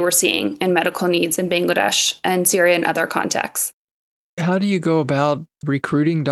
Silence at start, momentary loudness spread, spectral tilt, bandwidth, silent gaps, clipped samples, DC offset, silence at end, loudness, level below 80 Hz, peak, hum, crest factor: 0 s; 8 LU; -3.5 dB/octave; 13 kHz; 3.73-4.37 s; under 0.1%; under 0.1%; 0 s; -18 LUFS; -64 dBFS; -2 dBFS; none; 18 dB